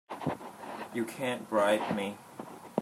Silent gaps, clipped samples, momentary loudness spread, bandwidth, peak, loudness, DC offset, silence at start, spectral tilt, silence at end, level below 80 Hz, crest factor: none; under 0.1%; 17 LU; 16 kHz; -12 dBFS; -33 LUFS; under 0.1%; 0.1 s; -5 dB/octave; 0 s; -74 dBFS; 20 dB